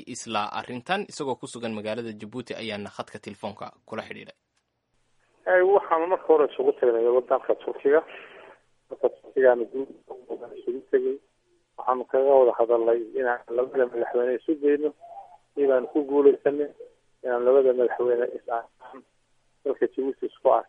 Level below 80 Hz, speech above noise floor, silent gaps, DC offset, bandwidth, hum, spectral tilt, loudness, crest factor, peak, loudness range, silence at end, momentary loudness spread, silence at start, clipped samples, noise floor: -72 dBFS; 51 dB; none; under 0.1%; 10.5 kHz; none; -5 dB/octave; -24 LUFS; 20 dB; -6 dBFS; 9 LU; 0.05 s; 18 LU; 0 s; under 0.1%; -75 dBFS